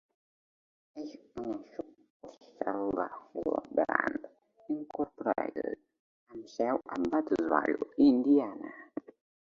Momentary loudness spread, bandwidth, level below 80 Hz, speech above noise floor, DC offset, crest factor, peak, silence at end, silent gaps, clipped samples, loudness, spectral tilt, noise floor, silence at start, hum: 19 LU; 7 kHz; -68 dBFS; 23 dB; under 0.1%; 24 dB; -8 dBFS; 0.6 s; 2.10-2.20 s, 5.99-6.27 s; under 0.1%; -32 LUFS; -7 dB/octave; -54 dBFS; 0.95 s; none